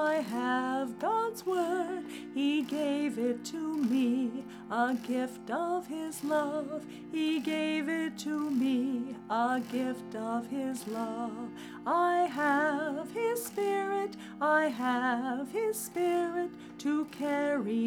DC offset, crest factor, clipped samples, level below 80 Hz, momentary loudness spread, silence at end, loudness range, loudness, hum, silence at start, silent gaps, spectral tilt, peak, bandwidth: under 0.1%; 16 dB; under 0.1%; -78 dBFS; 8 LU; 0 s; 3 LU; -32 LUFS; none; 0 s; none; -4.5 dB/octave; -16 dBFS; 18.5 kHz